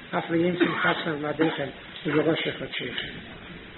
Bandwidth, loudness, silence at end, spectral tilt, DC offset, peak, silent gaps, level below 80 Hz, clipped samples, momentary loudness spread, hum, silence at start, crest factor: 4.2 kHz; -26 LUFS; 0 s; -3.5 dB/octave; under 0.1%; -8 dBFS; none; -58 dBFS; under 0.1%; 12 LU; none; 0 s; 18 dB